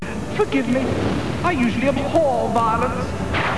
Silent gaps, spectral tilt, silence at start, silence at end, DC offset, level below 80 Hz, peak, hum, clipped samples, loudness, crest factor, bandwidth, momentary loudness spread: none; -6.5 dB/octave; 0 s; 0 s; 2%; -38 dBFS; -4 dBFS; none; under 0.1%; -20 LUFS; 16 dB; 11 kHz; 4 LU